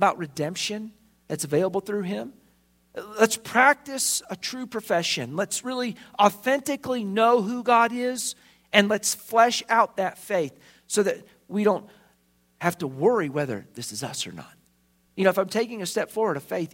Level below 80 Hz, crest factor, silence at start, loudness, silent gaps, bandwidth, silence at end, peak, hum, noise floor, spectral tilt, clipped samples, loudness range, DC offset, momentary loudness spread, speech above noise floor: -70 dBFS; 24 dB; 0 s; -24 LUFS; none; 16.5 kHz; 0.05 s; 0 dBFS; none; -65 dBFS; -3.5 dB/octave; under 0.1%; 5 LU; under 0.1%; 13 LU; 40 dB